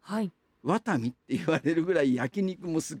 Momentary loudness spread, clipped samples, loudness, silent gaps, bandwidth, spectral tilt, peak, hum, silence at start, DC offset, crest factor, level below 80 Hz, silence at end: 7 LU; under 0.1%; -29 LUFS; none; 16.5 kHz; -6 dB/octave; -10 dBFS; none; 0.05 s; under 0.1%; 18 dB; -68 dBFS; 0 s